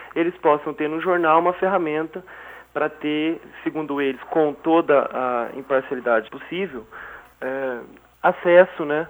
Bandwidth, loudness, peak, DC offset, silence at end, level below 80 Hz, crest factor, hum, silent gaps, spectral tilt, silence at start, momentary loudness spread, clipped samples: over 20 kHz; -21 LUFS; -2 dBFS; under 0.1%; 0 s; -62 dBFS; 18 dB; none; none; -7.5 dB/octave; 0 s; 15 LU; under 0.1%